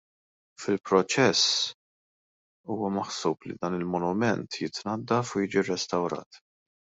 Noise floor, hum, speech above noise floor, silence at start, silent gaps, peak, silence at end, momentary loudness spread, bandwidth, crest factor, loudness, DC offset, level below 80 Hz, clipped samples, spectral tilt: under -90 dBFS; none; over 63 dB; 0.6 s; 1.74-2.64 s, 6.26-6.31 s; -8 dBFS; 0.45 s; 11 LU; 8.2 kHz; 20 dB; -27 LUFS; under 0.1%; -70 dBFS; under 0.1%; -4 dB/octave